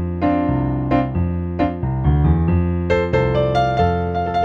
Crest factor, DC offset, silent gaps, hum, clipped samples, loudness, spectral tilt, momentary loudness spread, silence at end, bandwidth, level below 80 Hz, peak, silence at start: 14 dB; under 0.1%; none; none; under 0.1%; -19 LUFS; -9 dB/octave; 5 LU; 0 s; 7 kHz; -28 dBFS; -4 dBFS; 0 s